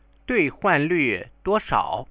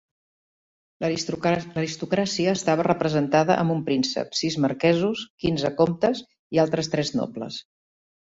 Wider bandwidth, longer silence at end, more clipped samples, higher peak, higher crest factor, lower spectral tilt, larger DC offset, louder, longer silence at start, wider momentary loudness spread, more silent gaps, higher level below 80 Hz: second, 4 kHz vs 8 kHz; second, 0.05 s vs 0.65 s; neither; about the same, -6 dBFS vs -6 dBFS; about the same, 18 dB vs 20 dB; first, -9.5 dB/octave vs -5.5 dB/octave; neither; about the same, -22 LUFS vs -24 LUFS; second, 0.3 s vs 1 s; second, 5 LU vs 8 LU; second, none vs 5.30-5.38 s, 6.39-6.50 s; first, -48 dBFS vs -58 dBFS